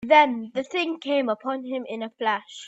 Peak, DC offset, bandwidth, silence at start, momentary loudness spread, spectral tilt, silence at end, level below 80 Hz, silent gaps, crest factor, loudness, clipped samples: -4 dBFS; under 0.1%; 8 kHz; 0 s; 12 LU; -4 dB/octave; 0 s; -72 dBFS; none; 20 dB; -25 LUFS; under 0.1%